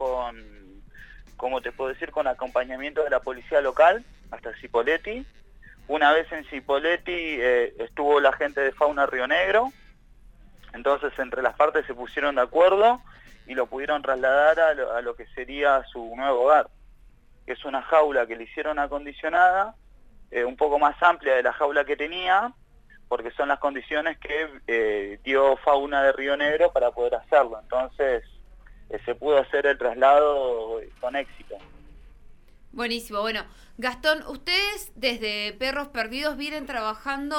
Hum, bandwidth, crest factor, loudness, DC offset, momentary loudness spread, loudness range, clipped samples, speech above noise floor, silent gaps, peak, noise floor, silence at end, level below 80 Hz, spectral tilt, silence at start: none; 16.5 kHz; 20 dB; -24 LUFS; under 0.1%; 12 LU; 4 LU; under 0.1%; 29 dB; none; -4 dBFS; -52 dBFS; 0 s; -50 dBFS; -3.5 dB/octave; 0 s